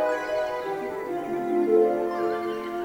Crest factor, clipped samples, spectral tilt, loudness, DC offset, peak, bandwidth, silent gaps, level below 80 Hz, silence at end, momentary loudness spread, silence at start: 16 dB; under 0.1%; -6 dB/octave; -26 LUFS; under 0.1%; -10 dBFS; 16.5 kHz; none; -62 dBFS; 0 s; 9 LU; 0 s